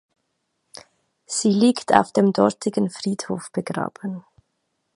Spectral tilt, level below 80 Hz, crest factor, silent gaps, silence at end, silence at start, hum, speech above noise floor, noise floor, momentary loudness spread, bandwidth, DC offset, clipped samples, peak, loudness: -5 dB/octave; -64 dBFS; 22 dB; none; 0.75 s; 1.3 s; none; 54 dB; -74 dBFS; 12 LU; 11.5 kHz; under 0.1%; under 0.1%; 0 dBFS; -21 LUFS